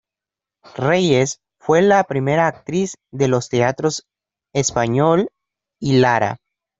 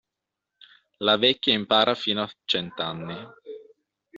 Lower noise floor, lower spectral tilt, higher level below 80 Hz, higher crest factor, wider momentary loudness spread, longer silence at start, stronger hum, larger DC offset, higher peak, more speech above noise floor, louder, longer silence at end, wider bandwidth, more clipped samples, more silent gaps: about the same, -88 dBFS vs -85 dBFS; first, -5 dB/octave vs -1.5 dB/octave; first, -54 dBFS vs -68 dBFS; second, 16 dB vs 22 dB; second, 12 LU vs 22 LU; second, 0.75 s vs 1 s; neither; neither; first, -2 dBFS vs -6 dBFS; first, 71 dB vs 61 dB; first, -18 LUFS vs -23 LUFS; first, 0.45 s vs 0 s; about the same, 8 kHz vs 7.6 kHz; neither; neither